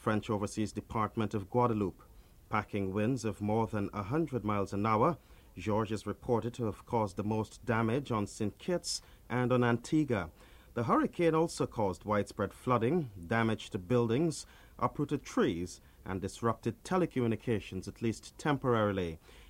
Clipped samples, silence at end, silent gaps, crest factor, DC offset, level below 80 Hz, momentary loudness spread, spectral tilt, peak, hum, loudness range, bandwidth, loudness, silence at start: under 0.1%; 0.05 s; none; 20 dB; under 0.1%; -58 dBFS; 9 LU; -6.5 dB/octave; -14 dBFS; none; 3 LU; 16 kHz; -33 LUFS; 0 s